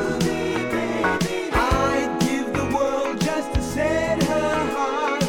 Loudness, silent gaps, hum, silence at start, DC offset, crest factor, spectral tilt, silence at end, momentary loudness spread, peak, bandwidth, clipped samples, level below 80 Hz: -22 LUFS; none; none; 0 s; under 0.1%; 16 dB; -5 dB/octave; 0 s; 3 LU; -6 dBFS; 18 kHz; under 0.1%; -36 dBFS